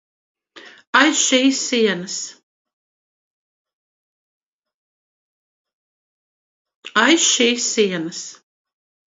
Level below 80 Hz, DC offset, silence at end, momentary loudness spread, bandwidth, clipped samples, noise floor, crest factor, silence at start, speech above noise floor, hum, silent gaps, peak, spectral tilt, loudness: -74 dBFS; under 0.1%; 0.85 s; 15 LU; 8 kHz; under 0.1%; -45 dBFS; 22 dB; 0.55 s; 27 dB; none; 0.87-0.93 s, 2.43-2.65 s, 2.73-3.65 s, 3.73-4.60 s, 4.74-5.65 s, 5.73-6.65 s, 6.75-6.82 s; 0 dBFS; -1.5 dB/octave; -16 LUFS